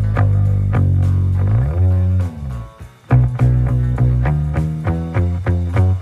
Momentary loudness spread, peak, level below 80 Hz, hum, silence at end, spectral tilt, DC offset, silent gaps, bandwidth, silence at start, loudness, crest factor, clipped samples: 5 LU; -2 dBFS; -24 dBFS; none; 0 s; -9.5 dB/octave; under 0.1%; none; 4 kHz; 0 s; -17 LUFS; 14 dB; under 0.1%